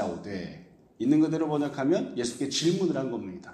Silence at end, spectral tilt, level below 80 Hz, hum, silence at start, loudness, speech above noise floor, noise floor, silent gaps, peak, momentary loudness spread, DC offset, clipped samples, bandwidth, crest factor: 0 s; -5 dB/octave; -66 dBFS; none; 0 s; -28 LUFS; 22 dB; -49 dBFS; none; -10 dBFS; 13 LU; under 0.1%; under 0.1%; 12 kHz; 18 dB